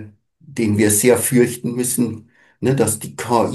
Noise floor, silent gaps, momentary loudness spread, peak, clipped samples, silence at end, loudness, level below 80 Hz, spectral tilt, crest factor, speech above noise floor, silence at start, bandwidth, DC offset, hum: -44 dBFS; none; 10 LU; -2 dBFS; under 0.1%; 0 s; -17 LUFS; -58 dBFS; -5 dB/octave; 18 dB; 27 dB; 0 s; 13 kHz; under 0.1%; none